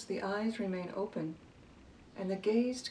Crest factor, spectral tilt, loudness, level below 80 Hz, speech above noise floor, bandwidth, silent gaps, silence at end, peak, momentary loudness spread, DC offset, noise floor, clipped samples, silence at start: 16 dB; -5.5 dB/octave; -36 LUFS; -68 dBFS; 22 dB; 11 kHz; none; 0 s; -20 dBFS; 11 LU; under 0.1%; -57 dBFS; under 0.1%; 0 s